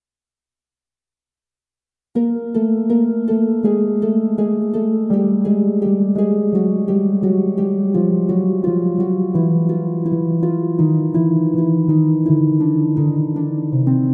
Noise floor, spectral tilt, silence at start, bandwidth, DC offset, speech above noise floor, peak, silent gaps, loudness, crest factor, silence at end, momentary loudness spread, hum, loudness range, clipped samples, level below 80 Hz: under -90 dBFS; -13.5 dB/octave; 2.15 s; 2.2 kHz; under 0.1%; over 74 dB; -4 dBFS; none; -17 LUFS; 14 dB; 0 s; 4 LU; none; 3 LU; under 0.1%; -62 dBFS